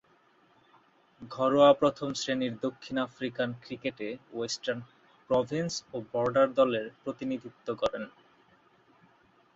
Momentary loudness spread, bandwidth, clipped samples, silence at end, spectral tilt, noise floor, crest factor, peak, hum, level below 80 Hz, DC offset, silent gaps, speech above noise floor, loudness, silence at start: 15 LU; 8 kHz; under 0.1%; 1.45 s; -5 dB/octave; -65 dBFS; 22 dB; -10 dBFS; none; -68 dBFS; under 0.1%; none; 35 dB; -30 LUFS; 1.2 s